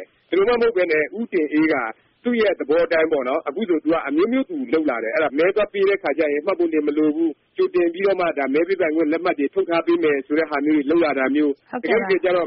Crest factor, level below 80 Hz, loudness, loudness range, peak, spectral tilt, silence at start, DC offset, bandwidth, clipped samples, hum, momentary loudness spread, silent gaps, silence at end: 14 dB; -58 dBFS; -20 LUFS; 1 LU; -6 dBFS; -3.5 dB/octave; 0 s; under 0.1%; 5.6 kHz; under 0.1%; none; 5 LU; none; 0 s